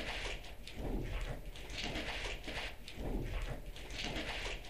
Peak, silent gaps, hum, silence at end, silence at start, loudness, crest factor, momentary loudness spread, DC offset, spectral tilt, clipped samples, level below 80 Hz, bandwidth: -24 dBFS; none; none; 0 s; 0 s; -43 LUFS; 18 dB; 6 LU; 0.3%; -4 dB/octave; under 0.1%; -46 dBFS; 15.5 kHz